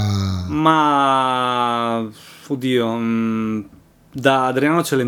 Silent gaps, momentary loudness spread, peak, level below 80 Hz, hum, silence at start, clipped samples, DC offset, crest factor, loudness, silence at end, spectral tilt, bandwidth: none; 10 LU; 0 dBFS; -52 dBFS; none; 0 s; under 0.1%; under 0.1%; 18 dB; -18 LUFS; 0 s; -5.5 dB/octave; 18.5 kHz